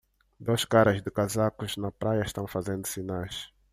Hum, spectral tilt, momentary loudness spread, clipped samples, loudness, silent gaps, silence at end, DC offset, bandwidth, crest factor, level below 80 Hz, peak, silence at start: none; -5 dB/octave; 12 LU; under 0.1%; -28 LUFS; none; 0.25 s; under 0.1%; 15.5 kHz; 20 dB; -56 dBFS; -8 dBFS; 0.4 s